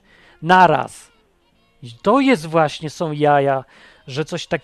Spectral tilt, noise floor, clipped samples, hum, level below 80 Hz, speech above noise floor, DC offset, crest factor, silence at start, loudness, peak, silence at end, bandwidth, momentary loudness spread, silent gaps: -6 dB/octave; -59 dBFS; under 0.1%; none; -56 dBFS; 42 dB; under 0.1%; 18 dB; 0.4 s; -17 LUFS; 0 dBFS; 0.05 s; 13 kHz; 14 LU; none